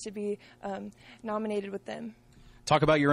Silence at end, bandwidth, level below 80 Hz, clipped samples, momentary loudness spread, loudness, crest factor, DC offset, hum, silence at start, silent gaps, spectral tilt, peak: 0 s; 12.5 kHz; -56 dBFS; under 0.1%; 18 LU; -31 LUFS; 20 dB; under 0.1%; none; 0 s; none; -5.5 dB/octave; -12 dBFS